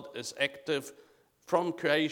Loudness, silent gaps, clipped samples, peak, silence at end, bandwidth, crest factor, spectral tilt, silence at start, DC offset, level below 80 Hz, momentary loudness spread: -32 LUFS; none; under 0.1%; -12 dBFS; 0 s; 18.5 kHz; 20 dB; -4 dB/octave; 0 s; under 0.1%; -80 dBFS; 9 LU